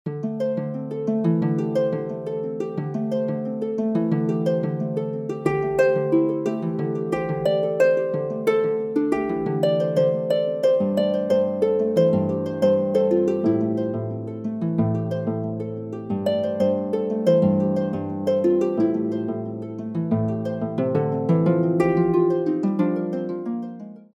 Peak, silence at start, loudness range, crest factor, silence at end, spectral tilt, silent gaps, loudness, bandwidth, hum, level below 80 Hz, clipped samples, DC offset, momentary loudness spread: -6 dBFS; 0.05 s; 4 LU; 16 dB; 0.1 s; -9 dB/octave; none; -23 LUFS; 11 kHz; none; -60 dBFS; under 0.1%; under 0.1%; 9 LU